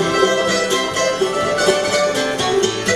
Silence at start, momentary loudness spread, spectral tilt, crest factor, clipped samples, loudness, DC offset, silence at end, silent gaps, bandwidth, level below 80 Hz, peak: 0 s; 3 LU; -2.5 dB/octave; 16 dB; under 0.1%; -17 LUFS; under 0.1%; 0 s; none; 15 kHz; -48 dBFS; -2 dBFS